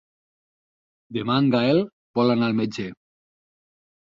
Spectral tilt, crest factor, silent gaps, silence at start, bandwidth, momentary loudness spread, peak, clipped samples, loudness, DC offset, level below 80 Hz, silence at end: -7.5 dB/octave; 18 dB; 1.93-2.14 s; 1.1 s; 7.4 kHz; 14 LU; -8 dBFS; under 0.1%; -22 LUFS; under 0.1%; -64 dBFS; 1.1 s